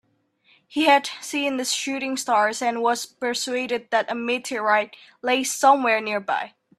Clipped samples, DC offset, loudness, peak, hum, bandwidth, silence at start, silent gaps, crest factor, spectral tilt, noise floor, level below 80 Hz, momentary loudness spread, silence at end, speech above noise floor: under 0.1%; under 0.1%; -22 LUFS; -4 dBFS; none; 14.5 kHz; 0.7 s; none; 20 dB; -1.5 dB/octave; -63 dBFS; -76 dBFS; 9 LU; 0.3 s; 41 dB